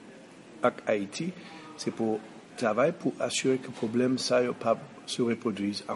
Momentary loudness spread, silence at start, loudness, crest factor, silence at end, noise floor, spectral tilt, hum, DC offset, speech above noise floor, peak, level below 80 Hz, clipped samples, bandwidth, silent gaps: 15 LU; 0 s; -30 LUFS; 18 dB; 0 s; -50 dBFS; -4.5 dB/octave; none; under 0.1%; 21 dB; -12 dBFS; -76 dBFS; under 0.1%; 11.5 kHz; none